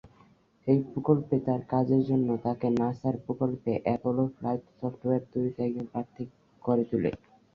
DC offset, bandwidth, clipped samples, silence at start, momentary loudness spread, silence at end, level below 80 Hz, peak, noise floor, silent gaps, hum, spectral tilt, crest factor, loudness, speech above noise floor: under 0.1%; 5.8 kHz; under 0.1%; 0.05 s; 11 LU; 0.4 s; -62 dBFS; -8 dBFS; -61 dBFS; none; none; -11 dB/octave; 20 dB; -29 LUFS; 33 dB